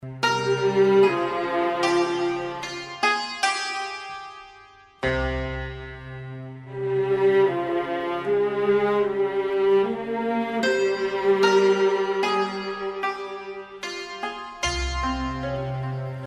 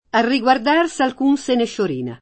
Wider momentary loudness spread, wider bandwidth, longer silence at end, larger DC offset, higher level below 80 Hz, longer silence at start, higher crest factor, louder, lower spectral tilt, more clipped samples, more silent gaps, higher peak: first, 15 LU vs 6 LU; first, 11.5 kHz vs 8.8 kHz; about the same, 0 s vs 0.05 s; neither; first, -42 dBFS vs -56 dBFS; second, 0 s vs 0.15 s; about the same, 18 dB vs 16 dB; second, -24 LUFS vs -18 LUFS; about the same, -5 dB/octave vs -4.5 dB/octave; neither; neither; second, -6 dBFS vs -2 dBFS